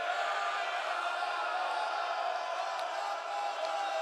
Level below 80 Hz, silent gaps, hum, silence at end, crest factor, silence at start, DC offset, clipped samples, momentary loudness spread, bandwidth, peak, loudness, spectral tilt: under -90 dBFS; none; none; 0 s; 14 dB; 0 s; under 0.1%; under 0.1%; 3 LU; 13 kHz; -20 dBFS; -34 LUFS; 1.5 dB/octave